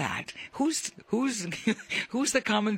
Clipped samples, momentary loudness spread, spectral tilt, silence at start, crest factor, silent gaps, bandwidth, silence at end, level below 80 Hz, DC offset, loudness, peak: under 0.1%; 6 LU; -3 dB/octave; 0 s; 18 dB; none; 16 kHz; 0 s; -66 dBFS; under 0.1%; -29 LUFS; -10 dBFS